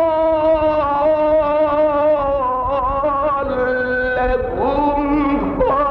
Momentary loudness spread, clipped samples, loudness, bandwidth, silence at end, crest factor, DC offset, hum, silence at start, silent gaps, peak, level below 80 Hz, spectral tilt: 3 LU; under 0.1%; -17 LUFS; 5.4 kHz; 0 s; 10 dB; under 0.1%; none; 0 s; none; -6 dBFS; -34 dBFS; -8.5 dB/octave